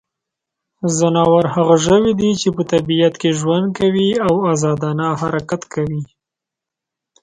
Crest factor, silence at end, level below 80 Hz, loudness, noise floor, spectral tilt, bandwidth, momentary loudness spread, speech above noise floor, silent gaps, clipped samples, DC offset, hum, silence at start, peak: 16 dB; 1.2 s; -48 dBFS; -16 LUFS; -84 dBFS; -5.5 dB/octave; 10.5 kHz; 9 LU; 69 dB; none; under 0.1%; under 0.1%; none; 0.8 s; 0 dBFS